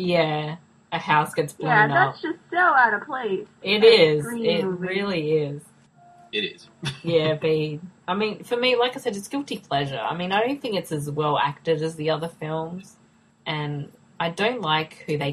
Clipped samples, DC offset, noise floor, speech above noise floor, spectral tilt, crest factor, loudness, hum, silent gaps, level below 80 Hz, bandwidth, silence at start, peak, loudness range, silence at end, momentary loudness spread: under 0.1%; under 0.1%; -53 dBFS; 30 dB; -5.5 dB/octave; 22 dB; -23 LUFS; none; none; -64 dBFS; 13 kHz; 0 s; -2 dBFS; 8 LU; 0 s; 14 LU